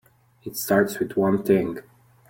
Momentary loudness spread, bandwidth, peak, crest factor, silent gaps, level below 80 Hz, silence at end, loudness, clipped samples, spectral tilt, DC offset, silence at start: 15 LU; 17 kHz; -6 dBFS; 18 dB; none; -60 dBFS; 0.5 s; -23 LUFS; under 0.1%; -6 dB/octave; under 0.1%; 0.45 s